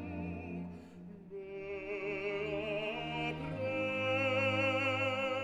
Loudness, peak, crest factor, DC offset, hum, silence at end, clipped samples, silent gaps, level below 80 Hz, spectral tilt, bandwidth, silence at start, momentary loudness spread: -35 LUFS; -20 dBFS; 16 dB; under 0.1%; none; 0 s; under 0.1%; none; -62 dBFS; -6 dB/octave; 11 kHz; 0 s; 17 LU